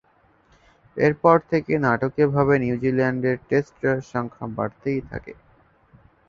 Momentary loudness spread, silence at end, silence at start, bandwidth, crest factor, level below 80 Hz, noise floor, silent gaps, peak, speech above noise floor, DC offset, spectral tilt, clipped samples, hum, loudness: 11 LU; 0.95 s; 0.95 s; 7.2 kHz; 20 dB; -52 dBFS; -60 dBFS; none; -2 dBFS; 38 dB; under 0.1%; -8.5 dB/octave; under 0.1%; none; -22 LUFS